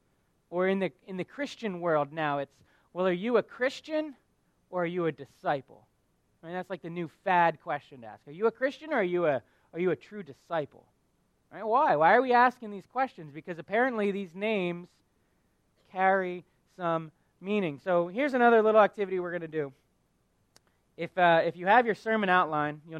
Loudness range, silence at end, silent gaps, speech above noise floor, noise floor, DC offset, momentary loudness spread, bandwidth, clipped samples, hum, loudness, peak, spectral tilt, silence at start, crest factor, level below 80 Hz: 6 LU; 0 s; none; 43 dB; -72 dBFS; under 0.1%; 17 LU; 10.5 kHz; under 0.1%; none; -28 LUFS; -8 dBFS; -7 dB/octave; 0.5 s; 22 dB; -76 dBFS